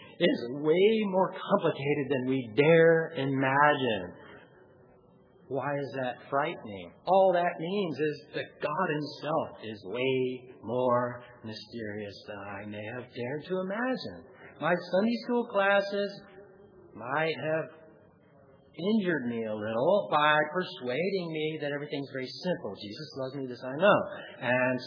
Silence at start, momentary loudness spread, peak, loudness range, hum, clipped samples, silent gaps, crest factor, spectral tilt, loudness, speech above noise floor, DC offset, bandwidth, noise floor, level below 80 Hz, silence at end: 0 s; 16 LU; -8 dBFS; 8 LU; none; under 0.1%; none; 22 dB; -7.5 dB/octave; -29 LUFS; 30 dB; under 0.1%; 5.4 kHz; -59 dBFS; -76 dBFS; 0 s